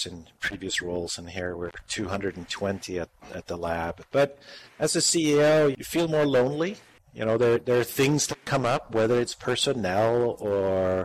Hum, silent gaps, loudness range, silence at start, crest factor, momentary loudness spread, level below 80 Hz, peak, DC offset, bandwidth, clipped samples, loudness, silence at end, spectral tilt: none; none; 8 LU; 0 s; 14 dB; 12 LU; -58 dBFS; -12 dBFS; under 0.1%; 15.5 kHz; under 0.1%; -26 LUFS; 0 s; -4 dB/octave